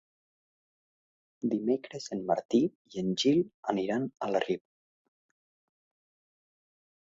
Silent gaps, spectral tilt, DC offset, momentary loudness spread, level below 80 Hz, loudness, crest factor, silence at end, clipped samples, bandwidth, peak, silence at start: 2.45-2.49 s, 2.75-2.85 s, 3.54-3.63 s; -5.5 dB/octave; under 0.1%; 9 LU; -72 dBFS; -31 LUFS; 22 dB; 2.6 s; under 0.1%; 7.8 kHz; -12 dBFS; 1.45 s